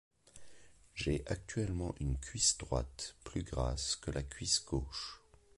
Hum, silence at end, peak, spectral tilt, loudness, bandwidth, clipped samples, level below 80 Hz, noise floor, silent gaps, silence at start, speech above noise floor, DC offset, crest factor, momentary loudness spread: none; 0.4 s; -18 dBFS; -3.5 dB/octave; -37 LUFS; 11.5 kHz; under 0.1%; -46 dBFS; -59 dBFS; none; 0.25 s; 21 dB; under 0.1%; 20 dB; 13 LU